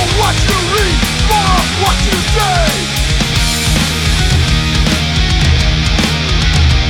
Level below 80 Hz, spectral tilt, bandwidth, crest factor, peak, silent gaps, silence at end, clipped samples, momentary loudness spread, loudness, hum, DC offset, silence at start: -16 dBFS; -4 dB/octave; 18 kHz; 10 dB; 0 dBFS; none; 0 s; under 0.1%; 2 LU; -12 LUFS; none; under 0.1%; 0 s